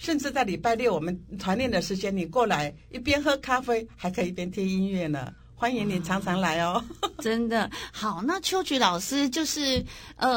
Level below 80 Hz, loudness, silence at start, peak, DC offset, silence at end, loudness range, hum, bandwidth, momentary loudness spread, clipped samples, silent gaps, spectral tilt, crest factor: -50 dBFS; -27 LUFS; 0 s; -8 dBFS; under 0.1%; 0 s; 2 LU; none; 17 kHz; 8 LU; under 0.1%; none; -4.5 dB/octave; 20 dB